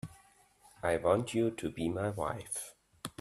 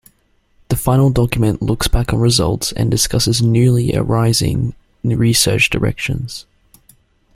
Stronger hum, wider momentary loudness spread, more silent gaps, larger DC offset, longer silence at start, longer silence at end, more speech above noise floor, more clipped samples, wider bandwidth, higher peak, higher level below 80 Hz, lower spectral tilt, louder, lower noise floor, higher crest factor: neither; first, 16 LU vs 9 LU; neither; neither; second, 0.05 s vs 0.7 s; second, 0.1 s vs 0.95 s; second, 31 dB vs 43 dB; neither; about the same, 15.5 kHz vs 16 kHz; second, -14 dBFS vs -2 dBFS; second, -62 dBFS vs -30 dBFS; about the same, -5.5 dB/octave vs -5 dB/octave; second, -34 LUFS vs -15 LUFS; first, -64 dBFS vs -58 dBFS; first, 22 dB vs 14 dB